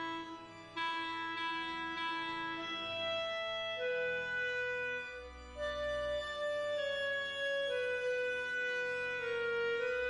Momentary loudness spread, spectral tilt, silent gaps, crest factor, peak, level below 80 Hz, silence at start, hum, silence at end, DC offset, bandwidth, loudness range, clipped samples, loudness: 6 LU; -3 dB/octave; none; 12 dB; -26 dBFS; -62 dBFS; 0 s; none; 0 s; under 0.1%; 11 kHz; 2 LU; under 0.1%; -37 LUFS